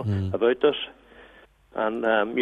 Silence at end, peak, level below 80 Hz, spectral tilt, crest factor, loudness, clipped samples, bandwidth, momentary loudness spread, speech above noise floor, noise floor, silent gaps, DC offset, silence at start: 0 s; -8 dBFS; -60 dBFS; -8 dB/octave; 16 dB; -24 LUFS; under 0.1%; 5 kHz; 13 LU; 30 dB; -54 dBFS; none; under 0.1%; 0 s